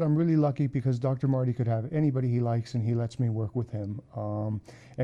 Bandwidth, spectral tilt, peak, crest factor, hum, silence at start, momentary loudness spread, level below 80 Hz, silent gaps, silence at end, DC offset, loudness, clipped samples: 7.8 kHz; -9.5 dB/octave; -14 dBFS; 14 dB; none; 0 s; 10 LU; -60 dBFS; none; 0 s; under 0.1%; -29 LUFS; under 0.1%